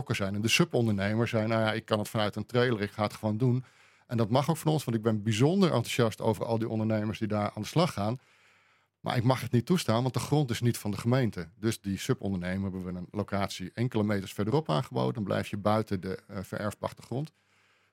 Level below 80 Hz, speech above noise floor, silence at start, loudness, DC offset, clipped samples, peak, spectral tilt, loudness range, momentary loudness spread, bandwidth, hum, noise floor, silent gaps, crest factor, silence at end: -66 dBFS; 38 dB; 0 s; -30 LUFS; under 0.1%; under 0.1%; -8 dBFS; -6 dB/octave; 3 LU; 9 LU; 16.5 kHz; none; -67 dBFS; none; 20 dB; 0.65 s